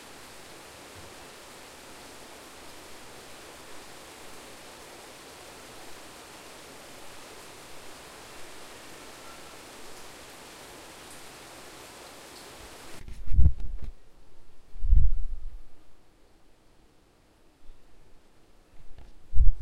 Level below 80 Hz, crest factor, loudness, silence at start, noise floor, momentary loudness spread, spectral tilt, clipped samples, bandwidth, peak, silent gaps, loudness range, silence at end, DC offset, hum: -34 dBFS; 24 dB; -38 LUFS; 3.75 s; -60 dBFS; 16 LU; -4.5 dB/octave; under 0.1%; 13.5 kHz; -4 dBFS; none; 13 LU; 0 s; under 0.1%; none